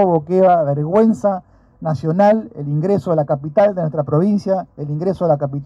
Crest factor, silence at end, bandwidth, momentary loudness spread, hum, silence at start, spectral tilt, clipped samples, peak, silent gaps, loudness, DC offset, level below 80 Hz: 14 dB; 0 s; 8 kHz; 8 LU; none; 0 s; -9.5 dB/octave; under 0.1%; -4 dBFS; none; -17 LUFS; under 0.1%; -54 dBFS